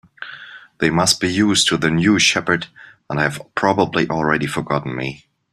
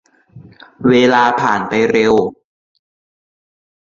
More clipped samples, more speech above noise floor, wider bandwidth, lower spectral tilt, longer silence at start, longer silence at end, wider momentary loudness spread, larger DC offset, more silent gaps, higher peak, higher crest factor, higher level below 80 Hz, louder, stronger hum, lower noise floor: neither; second, 21 dB vs 29 dB; first, 15 kHz vs 7.4 kHz; second, -3.5 dB/octave vs -5.5 dB/octave; second, 0.2 s vs 0.35 s; second, 0.35 s vs 1.7 s; first, 15 LU vs 6 LU; neither; neither; about the same, 0 dBFS vs -2 dBFS; about the same, 18 dB vs 16 dB; about the same, -50 dBFS vs -54 dBFS; second, -17 LUFS vs -13 LUFS; neither; about the same, -39 dBFS vs -41 dBFS